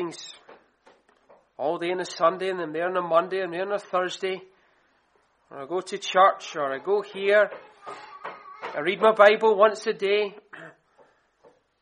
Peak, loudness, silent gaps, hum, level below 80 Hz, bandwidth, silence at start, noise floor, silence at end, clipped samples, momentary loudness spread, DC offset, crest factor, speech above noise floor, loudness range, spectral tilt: -4 dBFS; -24 LUFS; none; none; -80 dBFS; 10 kHz; 0 s; -66 dBFS; 1.1 s; under 0.1%; 22 LU; under 0.1%; 22 dB; 42 dB; 6 LU; -4 dB/octave